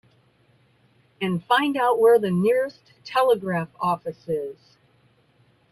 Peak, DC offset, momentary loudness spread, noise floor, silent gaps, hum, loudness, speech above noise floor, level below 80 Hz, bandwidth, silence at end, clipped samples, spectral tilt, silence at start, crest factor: -6 dBFS; under 0.1%; 12 LU; -61 dBFS; none; none; -22 LUFS; 39 dB; -68 dBFS; 13.5 kHz; 1.2 s; under 0.1%; -6.5 dB/octave; 1.2 s; 18 dB